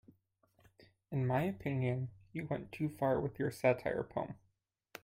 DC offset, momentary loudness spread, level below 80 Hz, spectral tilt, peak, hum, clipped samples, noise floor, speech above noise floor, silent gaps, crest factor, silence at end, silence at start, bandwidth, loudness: under 0.1%; 11 LU; -66 dBFS; -8 dB/octave; -16 dBFS; none; under 0.1%; -79 dBFS; 43 dB; none; 22 dB; 0.7 s; 1.1 s; 16 kHz; -37 LUFS